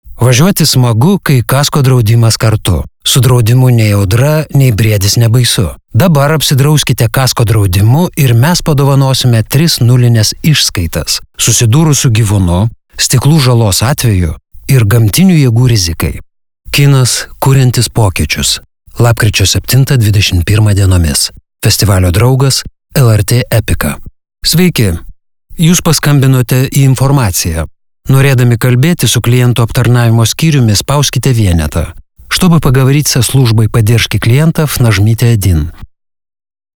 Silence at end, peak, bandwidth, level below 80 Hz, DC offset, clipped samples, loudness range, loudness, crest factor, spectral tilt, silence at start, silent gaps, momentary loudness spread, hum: 0.9 s; 0 dBFS; 20 kHz; -28 dBFS; under 0.1%; under 0.1%; 2 LU; -8 LUFS; 8 dB; -5 dB/octave; 0.05 s; none; 6 LU; none